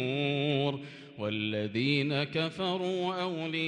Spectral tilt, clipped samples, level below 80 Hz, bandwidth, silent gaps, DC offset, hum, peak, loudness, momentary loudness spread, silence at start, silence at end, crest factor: -6.5 dB/octave; under 0.1%; -74 dBFS; 9.8 kHz; none; under 0.1%; none; -16 dBFS; -31 LUFS; 6 LU; 0 s; 0 s; 16 dB